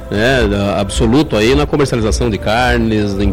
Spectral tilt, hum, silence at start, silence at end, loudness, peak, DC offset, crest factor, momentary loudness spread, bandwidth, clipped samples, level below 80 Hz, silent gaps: -5.5 dB/octave; none; 0 s; 0 s; -13 LUFS; -4 dBFS; under 0.1%; 8 dB; 3 LU; 16 kHz; under 0.1%; -22 dBFS; none